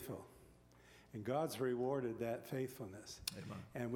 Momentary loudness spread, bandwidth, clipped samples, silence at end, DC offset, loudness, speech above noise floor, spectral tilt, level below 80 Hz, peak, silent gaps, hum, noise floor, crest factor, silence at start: 14 LU; 17 kHz; under 0.1%; 0 s; under 0.1%; -43 LUFS; 23 dB; -5.5 dB/octave; -72 dBFS; -20 dBFS; none; none; -65 dBFS; 24 dB; 0 s